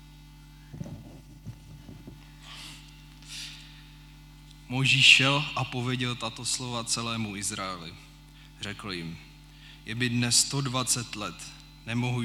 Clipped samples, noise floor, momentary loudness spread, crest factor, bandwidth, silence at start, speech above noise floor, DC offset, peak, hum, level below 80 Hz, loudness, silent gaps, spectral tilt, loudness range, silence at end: under 0.1%; -50 dBFS; 25 LU; 26 dB; 18 kHz; 0 s; 23 dB; under 0.1%; -4 dBFS; 50 Hz at -50 dBFS; -54 dBFS; -25 LUFS; none; -2.5 dB/octave; 21 LU; 0 s